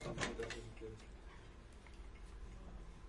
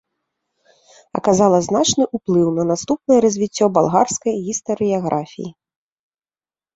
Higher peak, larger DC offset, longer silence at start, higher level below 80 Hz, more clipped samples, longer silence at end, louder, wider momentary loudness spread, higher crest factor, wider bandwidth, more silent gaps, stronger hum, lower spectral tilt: second, -24 dBFS vs -2 dBFS; neither; second, 0 s vs 1.15 s; about the same, -54 dBFS vs -56 dBFS; neither; second, 0 s vs 1.25 s; second, -51 LUFS vs -17 LUFS; first, 16 LU vs 9 LU; first, 26 dB vs 18 dB; first, 11.5 kHz vs 8.2 kHz; neither; neither; about the same, -4 dB/octave vs -5 dB/octave